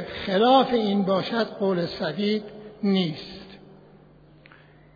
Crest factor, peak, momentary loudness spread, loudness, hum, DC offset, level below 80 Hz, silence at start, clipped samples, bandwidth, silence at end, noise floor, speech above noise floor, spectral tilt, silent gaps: 18 dB; -8 dBFS; 17 LU; -23 LUFS; none; under 0.1%; -58 dBFS; 0 s; under 0.1%; 5 kHz; 1.4 s; -52 dBFS; 29 dB; -7.5 dB/octave; none